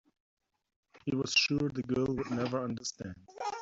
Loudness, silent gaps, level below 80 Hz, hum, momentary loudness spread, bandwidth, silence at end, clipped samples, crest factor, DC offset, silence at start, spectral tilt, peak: -32 LUFS; none; -62 dBFS; none; 14 LU; 8 kHz; 0 s; under 0.1%; 20 dB; under 0.1%; 0.95 s; -4 dB/octave; -14 dBFS